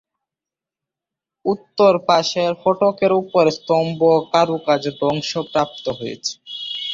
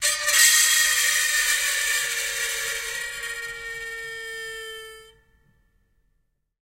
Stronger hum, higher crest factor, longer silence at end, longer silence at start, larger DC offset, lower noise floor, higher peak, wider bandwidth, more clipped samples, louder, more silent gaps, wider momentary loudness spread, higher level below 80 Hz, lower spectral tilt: neither; about the same, 18 dB vs 20 dB; second, 0 s vs 1.6 s; first, 1.45 s vs 0 s; neither; first, -88 dBFS vs -71 dBFS; about the same, -2 dBFS vs -4 dBFS; second, 7.6 kHz vs 16 kHz; neither; about the same, -18 LUFS vs -20 LUFS; neither; second, 11 LU vs 18 LU; about the same, -60 dBFS vs -58 dBFS; first, -5 dB/octave vs 4 dB/octave